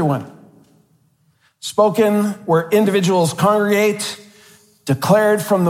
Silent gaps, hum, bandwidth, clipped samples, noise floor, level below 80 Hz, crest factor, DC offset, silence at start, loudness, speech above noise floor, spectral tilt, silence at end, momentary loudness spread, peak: none; none; 16.5 kHz; under 0.1%; -60 dBFS; -64 dBFS; 16 dB; under 0.1%; 0 s; -16 LUFS; 44 dB; -5.5 dB/octave; 0 s; 11 LU; -2 dBFS